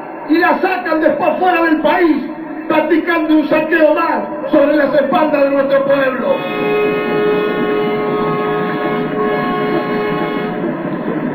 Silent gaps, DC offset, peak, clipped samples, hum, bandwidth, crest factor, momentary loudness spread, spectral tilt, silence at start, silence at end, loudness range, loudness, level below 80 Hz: none; under 0.1%; 0 dBFS; under 0.1%; none; 18.5 kHz; 14 dB; 7 LU; -8.5 dB/octave; 0 s; 0 s; 4 LU; -14 LUFS; -50 dBFS